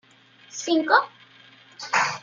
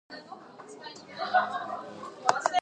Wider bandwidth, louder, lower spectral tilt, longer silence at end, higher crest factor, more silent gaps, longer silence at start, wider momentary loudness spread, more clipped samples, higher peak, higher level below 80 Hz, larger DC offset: second, 7.6 kHz vs 10 kHz; first, -22 LUFS vs -30 LUFS; about the same, -2 dB/octave vs -2 dB/octave; about the same, 0.05 s vs 0 s; second, 22 dB vs 30 dB; neither; first, 0.55 s vs 0.1 s; about the same, 19 LU vs 19 LU; neither; about the same, -4 dBFS vs -2 dBFS; about the same, -80 dBFS vs -82 dBFS; neither